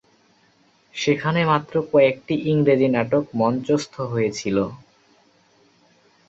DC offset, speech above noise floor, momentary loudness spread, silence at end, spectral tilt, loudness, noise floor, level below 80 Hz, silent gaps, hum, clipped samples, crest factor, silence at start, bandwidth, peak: under 0.1%; 39 dB; 7 LU; 1.55 s; -6.5 dB/octave; -21 LUFS; -59 dBFS; -58 dBFS; none; none; under 0.1%; 18 dB; 0.95 s; 8 kHz; -4 dBFS